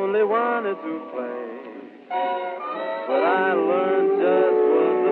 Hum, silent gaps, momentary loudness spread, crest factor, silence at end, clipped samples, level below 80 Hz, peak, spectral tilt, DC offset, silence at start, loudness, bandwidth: none; none; 13 LU; 12 dB; 0 s; under 0.1%; -80 dBFS; -8 dBFS; -8.5 dB/octave; under 0.1%; 0 s; -22 LUFS; 4.3 kHz